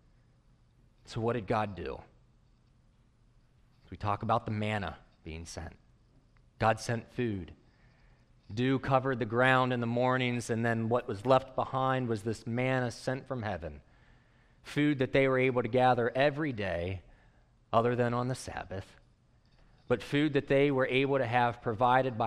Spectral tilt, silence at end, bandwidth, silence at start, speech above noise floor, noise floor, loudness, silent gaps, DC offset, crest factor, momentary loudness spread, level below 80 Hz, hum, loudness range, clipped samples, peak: -6.5 dB/octave; 0 s; 12.5 kHz; 1.1 s; 35 dB; -65 dBFS; -31 LUFS; none; under 0.1%; 22 dB; 15 LU; -58 dBFS; none; 8 LU; under 0.1%; -10 dBFS